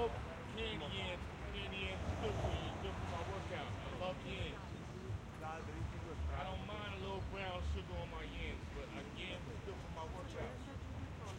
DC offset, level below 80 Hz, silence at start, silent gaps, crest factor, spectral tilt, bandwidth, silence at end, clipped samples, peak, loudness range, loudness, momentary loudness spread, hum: under 0.1%; -52 dBFS; 0 s; none; 18 dB; -5.5 dB/octave; 16 kHz; 0 s; under 0.1%; -26 dBFS; 3 LU; -45 LUFS; 6 LU; none